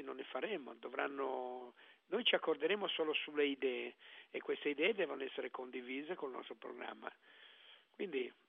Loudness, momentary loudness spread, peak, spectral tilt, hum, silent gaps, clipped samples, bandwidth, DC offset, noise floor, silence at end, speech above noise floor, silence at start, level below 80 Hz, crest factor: -40 LUFS; 17 LU; -20 dBFS; -0.5 dB/octave; none; none; under 0.1%; 5.2 kHz; under 0.1%; -64 dBFS; 0.15 s; 23 dB; 0 s; under -90 dBFS; 22 dB